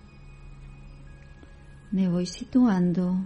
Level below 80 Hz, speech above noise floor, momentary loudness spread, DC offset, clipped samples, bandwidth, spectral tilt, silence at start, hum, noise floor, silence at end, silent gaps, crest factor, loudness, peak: -48 dBFS; 24 dB; 26 LU; under 0.1%; under 0.1%; 9 kHz; -7.5 dB/octave; 0.15 s; none; -47 dBFS; 0 s; none; 16 dB; -25 LUFS; -12 dBFS